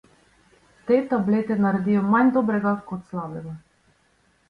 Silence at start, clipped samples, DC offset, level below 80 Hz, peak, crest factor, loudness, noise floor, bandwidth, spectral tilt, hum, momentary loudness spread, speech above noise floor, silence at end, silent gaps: 0.85 s; under 0.1%; under 0.1%; -60 dBFS; -8 dBFS; 16 dB; -22 LUFS; -63 dBFS; 5 kHz; -9.5 dB/octave; none; 18 LU; 42 dB; 0.9 s; none